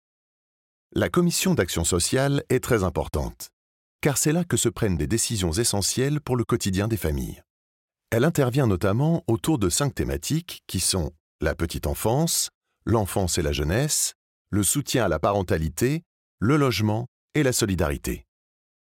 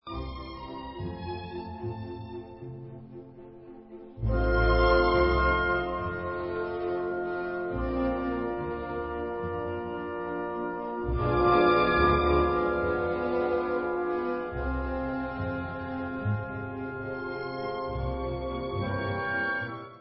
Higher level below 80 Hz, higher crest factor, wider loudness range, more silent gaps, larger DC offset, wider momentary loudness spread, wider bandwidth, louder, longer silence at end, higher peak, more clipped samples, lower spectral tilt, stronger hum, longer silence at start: about the same, -42 dBFS vs -38 dBFS; about the same, 18 dB vs 18 dB; second, 2 LU vs 8 LU; first, 3.53-3.99 s, 7.50-7.88 s, 11.20-11.39 s, 12.55-12.61 s, 14.15-14.45 s, 16.06-16.38 s, 17.08-17.28 s vs none; neither; second, 8 LU vs 17 LU; first, 17 kHz vs 5.8 kHz; first, -24 LUFS vs -29 LUFS; first, 0.8 s vs 0 s; about the same, -8 dBFS vs -10 dBFS; neither; second, -4.5 dB/octave vs -10.5 dB/octave; neither; first, 0.95 s vs 0.05 s